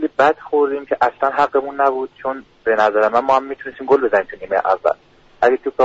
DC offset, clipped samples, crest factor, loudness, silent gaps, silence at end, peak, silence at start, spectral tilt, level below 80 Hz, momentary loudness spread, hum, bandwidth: under 0.1%; under 0.1%; 14 dB; -17 LUFS; none; 0 s; -4 dBFS; 0 s; -2.5 dB/octave; -56 dBFS; 10 LU; none; 7.8 kHz